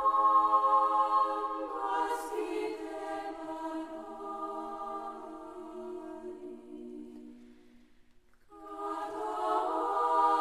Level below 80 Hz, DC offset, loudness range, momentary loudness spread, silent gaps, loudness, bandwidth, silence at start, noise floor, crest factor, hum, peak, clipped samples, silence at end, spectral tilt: -68 dBFS; under 0.1%; 16 LU; 21 LU; none; -32 LUFS; 14.5 kHz; 0 s; -63 dBFS; 18 dB; none; -14 dBFS; under 0.1%; 0 s; -3.5 dB/octave